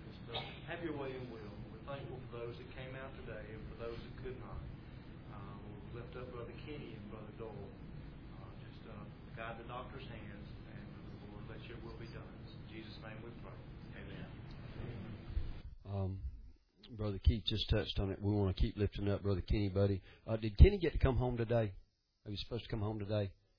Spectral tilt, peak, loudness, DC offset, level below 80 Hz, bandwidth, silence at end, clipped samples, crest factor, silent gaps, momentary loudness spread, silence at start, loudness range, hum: -6 dB/octave; -10 dBFS; -40 LUFS; under 0.1%; -44 dBFS; 5.4 kHz; 0.25 s; under 0.1%; 30 dB; none; 17 LU; 0 s; 16 LU; none